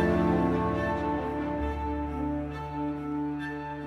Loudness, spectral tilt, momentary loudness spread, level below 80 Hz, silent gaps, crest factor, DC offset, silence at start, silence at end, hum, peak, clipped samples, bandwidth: -30 LUFS; -8.5 dB/octave; 8 LU; -40 dBFS; none; 16 dB; under 0.1%; 0 s; 0 s; none; -14 dBFS; under 0.1%; 10.5 kHz